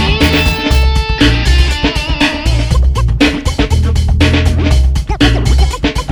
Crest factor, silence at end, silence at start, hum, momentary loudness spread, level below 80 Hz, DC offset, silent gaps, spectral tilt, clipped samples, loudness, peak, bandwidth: 10 dB; 0 s; 0 s; none; 4 LU; -12 dBFS; under 0.1%; none; -5.5 dB/octave; under 0.1%; -12 LUFS; 0 dBFS; over 20 kHz